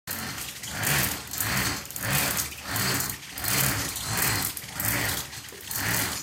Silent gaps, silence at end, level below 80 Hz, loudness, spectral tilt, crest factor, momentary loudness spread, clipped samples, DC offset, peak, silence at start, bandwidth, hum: none; 0 s; -48 dBFS; -26 LUFS; -2 dB/octave; 22 dB; 8 LU; under 0.1%; under 0.1%; -8 dBFS; 0.05 s; 17 kHz; none